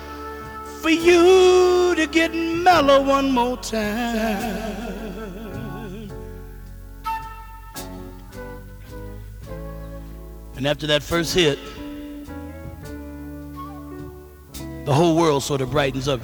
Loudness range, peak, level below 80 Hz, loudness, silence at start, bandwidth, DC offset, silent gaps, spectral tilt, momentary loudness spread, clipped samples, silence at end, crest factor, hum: 18 LU; -2 dBFS; -40 dBFS; -19 LUFS; 0 s; over 20 kHz; under 0.1%; none; -5 dB/octave; 22 LU; under 0.1%; 0 s; 20 dB; none